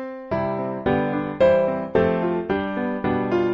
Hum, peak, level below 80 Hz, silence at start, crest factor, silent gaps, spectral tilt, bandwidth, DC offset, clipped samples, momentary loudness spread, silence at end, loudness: none; -6 dBFS; -48 dBFS; 0 s; 16 dB; none; -9 dB/octave; 6.6 kHz; under 0.1%; under 0.1%; 7 LU; 0 s; -22 LUFS